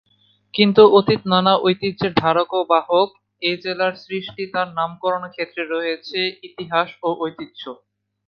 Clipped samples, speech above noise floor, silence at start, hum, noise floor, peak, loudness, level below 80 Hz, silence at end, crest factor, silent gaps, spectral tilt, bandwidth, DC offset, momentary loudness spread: under 0.1%; 41 dB; 0.55 s; none; -60 dBFS; 0 dBFS; -19 LUFS; -58 dBFS; 0.55 s; 20 dB; none; -8 dB/octave; 5.8 kHz; under 0.1%; 14 LU